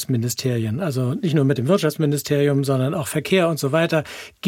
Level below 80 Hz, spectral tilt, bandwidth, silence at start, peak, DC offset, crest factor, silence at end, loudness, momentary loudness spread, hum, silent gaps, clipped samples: -60 dBFS; -6 dB/octave; 17 kHz; 0 s; -6 dBFS; under 0.1%; 14 dB; 0 s; -20 LUFS; 4 LU; none; none; under 0.1%